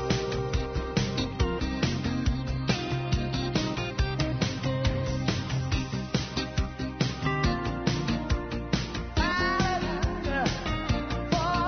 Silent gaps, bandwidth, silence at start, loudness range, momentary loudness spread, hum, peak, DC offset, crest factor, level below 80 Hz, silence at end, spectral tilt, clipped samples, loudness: none; 6.6 kHz; 0 s; 1 LU; 4 LU; none; -12 dBFS; under 0.1%; 18 dB; -36 dBFS; 0 s; -5.5 dB/octave; under 0.1%; -29 LUFS